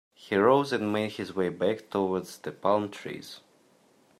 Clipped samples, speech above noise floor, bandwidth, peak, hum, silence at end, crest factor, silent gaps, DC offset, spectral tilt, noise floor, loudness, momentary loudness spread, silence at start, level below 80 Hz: under 0.1%; 35 dB; 14.5 kHz; -8 dBFS; none; 0.8 s; 20 dB; none; under 0.1%; -6 dB/octave; -63 dBFS; -28 LUFS; 17 LU; 0.2 s; -72 dBFS